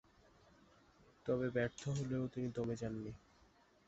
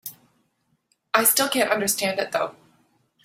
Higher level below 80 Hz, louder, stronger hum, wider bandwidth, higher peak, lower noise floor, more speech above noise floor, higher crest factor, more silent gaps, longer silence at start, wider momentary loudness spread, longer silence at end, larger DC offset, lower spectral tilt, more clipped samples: about the same, -66 dBFS vs -68 dBFS; second, -42 LUFS vs -21 LUFS; neither; second, 8 kHz vs 16.5 kHz; second, -24 dBFS vs -2 dBFS; about the same, -70 dBFS vs -70 dBFS; second, 29 dB vs 48 dB; second, 18 dB vs 24 dB; neither; first, 1.25 s vs 0.05 s; about the same, 11 LU vs 11 LU; about the same, 0.7 s vs 0.75 s; neither; first, -7 dB/octave vs -1.5 dB/octave; neither